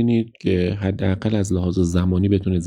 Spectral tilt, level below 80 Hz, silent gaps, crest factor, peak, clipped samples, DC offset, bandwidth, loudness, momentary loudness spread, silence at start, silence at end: -7.5 dB/octave; -40 dBFS; none; 14 dB; -4 dBFS; under 0.1%; under 0.1%; 11 kHz; -21 LUFS; 3 LU; 0 s; 0 s